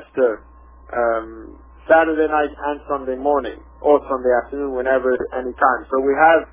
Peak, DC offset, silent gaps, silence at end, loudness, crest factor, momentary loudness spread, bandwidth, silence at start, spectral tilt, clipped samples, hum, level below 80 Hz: 0 dBFS; under 0.1%; none; 0.1 s; -19 LUFS; 18 dB; 12 LU; 3.7 kHz; 0 s; -9 dB/octave; under 0.1%; none; -44 dBFS